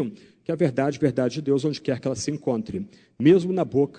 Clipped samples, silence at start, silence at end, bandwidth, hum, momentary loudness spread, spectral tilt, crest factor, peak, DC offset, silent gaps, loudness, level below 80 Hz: under 0.1%; 0 s; 0 s; 9.4 kHz; none; 14 LU; -6.5 dB/octave; 18 dB; -6 dBFS; under 0.1%; none; -24 LUFS; -60 dBFS